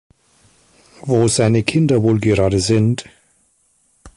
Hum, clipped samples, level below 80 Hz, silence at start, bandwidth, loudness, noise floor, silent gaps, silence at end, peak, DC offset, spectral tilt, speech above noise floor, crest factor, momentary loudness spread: none; under 0.1%; -40 dBFS; 1.05 s; 11.5 kHz; -16 LUFS; -60 dBFS; none; 0.1 s; -2 dBFS; under 0.1%; -6 dB/octave; 45 dB; 16 dB; 5 LU